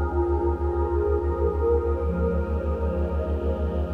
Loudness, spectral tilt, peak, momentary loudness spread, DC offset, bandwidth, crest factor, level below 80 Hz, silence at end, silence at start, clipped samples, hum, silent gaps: -25 LUFS; -11 dB/octave; -12 dBFS; 3 LU; under 0.1%; 3.5 kHz; 12 dB; -28 dBFS; 0 s; 0 s; under 0.1%; none; none